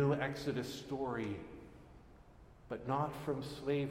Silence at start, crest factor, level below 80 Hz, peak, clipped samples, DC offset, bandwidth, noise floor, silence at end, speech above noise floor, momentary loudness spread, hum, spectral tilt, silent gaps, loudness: 0 s; 18 dB; -62 dBFS; -22 dBFS; under 0.1%; under 0.1%; 16 kHz; -59 dBFS; 0 s; 22 dB; 20 LU; none; -6.5 dB/octave; none; -40 LUFS